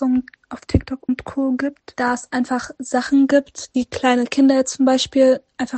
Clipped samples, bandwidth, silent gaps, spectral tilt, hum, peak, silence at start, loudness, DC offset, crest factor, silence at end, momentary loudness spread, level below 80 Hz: under 0.1%; 9 kHz; none; -5 dB/octave; none; -2 dBFS; 0 s; -19 LUFS; under 0.1%; 16 dB; 0 s; 9 LU; -42 dBFS